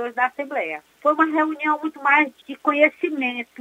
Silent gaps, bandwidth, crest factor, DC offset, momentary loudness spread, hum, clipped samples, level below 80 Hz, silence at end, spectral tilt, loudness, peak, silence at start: none; 9.4 kHz; 20 dB; under 0.1%; 8 LU; none; under 0.1%; -78 dBFS; 0.15 s; -4 dB/octave; -21 LUFS; -2 dBFS; 0 s